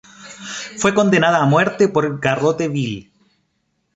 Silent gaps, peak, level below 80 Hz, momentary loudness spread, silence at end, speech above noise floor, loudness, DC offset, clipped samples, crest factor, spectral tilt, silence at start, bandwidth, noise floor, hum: none; -2 dBFS; -56 dBFS; 16 LU; 0.95 s; 52 dB; -17 LUFS; under 0.1%; under 0.1%; 18 dB; -5.5 dB/octave; 0.2 s; 8.4 kHz; -68 dBFS; none